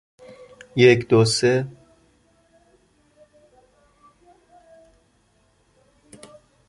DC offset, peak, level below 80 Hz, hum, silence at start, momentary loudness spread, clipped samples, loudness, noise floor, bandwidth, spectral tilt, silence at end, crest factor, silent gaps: under 0.1%; -2 dBFS; -60 dBFS; none; 0.75 s; 14 LU; under 0.1%; -18 LUFS; -63 dBFS; 11.5 kHz; -5 dB/octave; 5 s; 22 dB; none